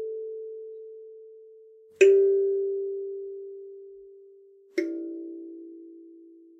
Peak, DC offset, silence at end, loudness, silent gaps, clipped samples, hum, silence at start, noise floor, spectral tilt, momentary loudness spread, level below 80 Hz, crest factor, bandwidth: -6 dBFS; under 0.1%; 0.35 s; -26 LUFS; none; under 0.1%; none; 0 s; -54 dBFS; -3 dB/octave; 27 LU; -86 dBFS; 22 dB; 8 kHz